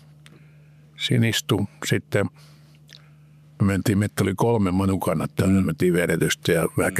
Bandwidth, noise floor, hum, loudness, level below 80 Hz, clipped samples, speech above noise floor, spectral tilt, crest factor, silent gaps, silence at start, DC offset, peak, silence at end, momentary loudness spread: 15 kHz; -50 dBFS; none; -22 LUFS; -54 dBFS; under 0.1%; 29 dB; -5.5 dB/octave; 14 dB; none; 1 s; under 0.1%; -8 dBFS; 0 s; 5 LU